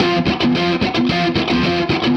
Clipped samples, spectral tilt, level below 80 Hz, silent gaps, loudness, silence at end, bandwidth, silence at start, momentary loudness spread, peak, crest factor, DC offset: under 0.1%; -6 dB/octave; -38 dBFS; none; -16 LUFS; 0 s; 8.2 kHz; 0 s; 1 LU; -4 dBFS; 12 dB; under 0.1%